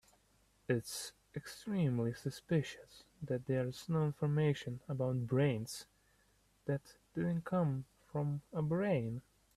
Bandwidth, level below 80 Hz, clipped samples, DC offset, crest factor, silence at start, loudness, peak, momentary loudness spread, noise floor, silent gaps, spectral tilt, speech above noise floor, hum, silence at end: 14 kHz; -68 dBFS; under 0.1%; under 0.1%; 16 dB; 0.7 s; -38 LUFS; -22 dBFS; 13 LU; -72 dBFS; none; -7 dB/octave; 36 dB; none; 0.35 s